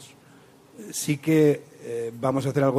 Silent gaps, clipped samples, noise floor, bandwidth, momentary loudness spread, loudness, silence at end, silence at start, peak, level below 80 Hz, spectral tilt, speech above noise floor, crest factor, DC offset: none; under 0.1%; -53 dBFS; 15.5 kHz; 14 LU; -25 LUFS; 0 s; 0 s; -8 dBFS; -66 dBFS; -6 dB/octave; 29 dB; 16 dB; under 0.1%